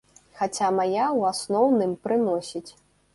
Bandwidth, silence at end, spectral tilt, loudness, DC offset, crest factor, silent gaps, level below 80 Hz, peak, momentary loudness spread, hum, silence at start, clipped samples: 11.5 kHz; 0.45 s; -5 dB/octave; -24 LUFS; under 0.1%; 16 dB; none; -66 dBFS; -10 dBFS; 9 LU; none; 0.35 s; under 0.1%